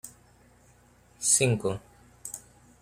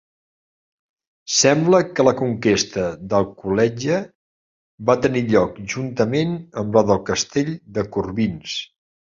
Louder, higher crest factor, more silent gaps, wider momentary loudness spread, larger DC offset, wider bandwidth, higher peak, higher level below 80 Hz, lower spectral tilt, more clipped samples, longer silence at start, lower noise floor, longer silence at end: second, -25 LUFS vs -20 LUFS; about the same, 24 dB vs 20 dB; second, none vs 4.15-4.78 s; first, 21 LU vs 11 LU; neither; first, 16 kHz vs 7.8 kHz; second, -8 dBFS vs -2 dBFS; second, -62 dBFS vs -50 dBFS; about the same, -3.5 dB/octave vs -4.5 dB/octave; neither; second, 0.05 s vs 1.25 s; second, -59 dBFS vs under -90 dBFS; second, 0.4 s vs 0.55 s